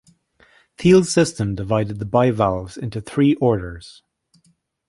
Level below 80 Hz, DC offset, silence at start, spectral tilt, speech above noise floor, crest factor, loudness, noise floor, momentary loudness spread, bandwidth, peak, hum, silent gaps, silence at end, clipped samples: -44 dBFS; under 0.1%; 0.8 s; -6 dB/octave; 44 dB; 18 dB; -19 LUFS; -62 dBFS; 14 LU; 11.5 kHz; -2 dBFS; none; none; 0.95 s; under 0.1%